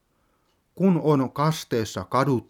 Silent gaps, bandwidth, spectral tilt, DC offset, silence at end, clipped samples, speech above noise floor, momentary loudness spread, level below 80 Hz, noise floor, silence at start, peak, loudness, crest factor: none; 17.5 kHz; -6.5 dB/octave; under 0.1%; 0.1 s; under 0.1%; 45 dB; 6 LU; -62 dBFS; -68 dBFS; 0.75 s; -6 dBFS; -24 LUFS; 18 dB